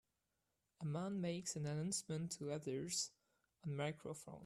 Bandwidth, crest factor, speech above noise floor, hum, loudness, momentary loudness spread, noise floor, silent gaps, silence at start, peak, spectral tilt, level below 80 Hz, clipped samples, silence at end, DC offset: 13.5 kHz; 18 dB; 44 dB; none; -45 LUFS; 8 LU; -88 dBFS; none; 0.8 s; -28 dBFS; -4.5 dB/octave; -80 dBFS; under 0.1%; 0 s; under 0.1%